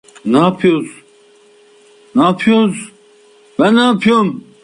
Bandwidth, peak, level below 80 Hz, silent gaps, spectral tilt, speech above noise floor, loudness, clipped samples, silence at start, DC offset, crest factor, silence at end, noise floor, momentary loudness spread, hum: 11 kHz; -2 dBFS; -56 dBFS; none; -6 dB/octave; 35 dB; -13 LUFS; under 0.1%; 0.25 s; under 0.1%; 14 dB; 0.25 s; -47 dBFS; 16 LU; none